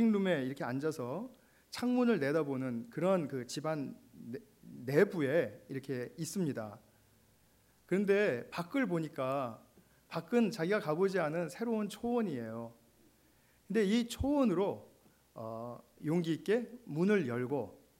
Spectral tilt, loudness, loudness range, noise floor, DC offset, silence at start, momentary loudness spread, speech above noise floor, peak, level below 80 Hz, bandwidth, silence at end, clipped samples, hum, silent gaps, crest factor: -6.5 dB/octave; -34 LUFS; 2 LU; -68 dBFS; under 0.1%; 0 s; 15 LU; 34 dB; -14 dBFS; -62 dBFS; 16 kHz; 0.25 s; under 0.1%; none; none; 20 dB